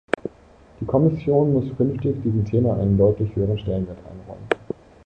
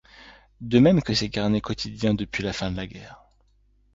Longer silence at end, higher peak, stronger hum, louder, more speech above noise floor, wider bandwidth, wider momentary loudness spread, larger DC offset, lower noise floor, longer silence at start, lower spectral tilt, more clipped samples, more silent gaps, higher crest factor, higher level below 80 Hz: second, 0.4 s vs 0.8 s; first, -2 dBFS vs -6 dBFS; neither; about the same, -21 LUFS vs -23 LUFS; second, 29 dB vs 38 dB; first, 8.8 kHz vs 7.8 kHz; about the same, 17 LU vs 17 LU; neither; second, -50 dBFS vs -62 dBFS; about the same, 0.25 s vs 0.2 s; first, -9.5 dB/octave vs -6 dB/octave; neither; neither; about the same, 20 dB vs 20 dB; about the same, -42 dBFS vs -46 dBFS